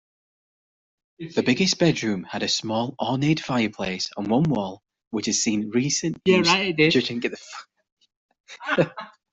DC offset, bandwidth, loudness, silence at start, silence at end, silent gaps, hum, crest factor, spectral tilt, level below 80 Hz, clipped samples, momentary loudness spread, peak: under 0.1%; 8.2 kHz; -23 LUFS; 1.2 s; 0.25 s; 5.07-5.11 s, 7.92-7.97 s, 8.16-8.29 s, 8.40-8.44 s; none; 20 dB; -4 dB/octave; -60 dBFS; under 0.1%; 13 LU; -4 dBFS